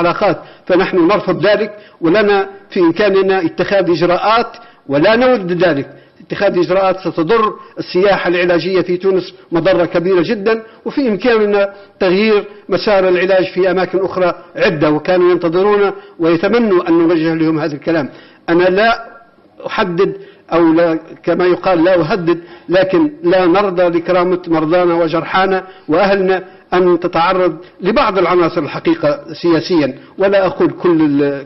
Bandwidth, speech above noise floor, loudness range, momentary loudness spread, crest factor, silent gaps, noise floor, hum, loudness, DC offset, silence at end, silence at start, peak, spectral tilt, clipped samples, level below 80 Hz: 6 kHz; 27 dB; 2 LU; 7 LU; 10 dB; none; -40 dBFS; none; -13 LUFS; under 0.1%; 0 s; 0 s; -4 dBFS; -7.5 dB/octave; under 0.1%; -46 dBFS